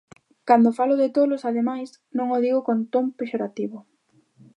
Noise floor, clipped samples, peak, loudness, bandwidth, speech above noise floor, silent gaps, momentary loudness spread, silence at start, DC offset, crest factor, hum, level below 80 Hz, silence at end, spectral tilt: -60 dBFS; under 0.1%; -4 dBFS; -22 LUFS; 9.6 kHz; 39 dB; none; 14 LU; 0.45 s; under 0.1%; 20 dB; none; -78 dBFS; 0.75 s; -7.5 dB/octave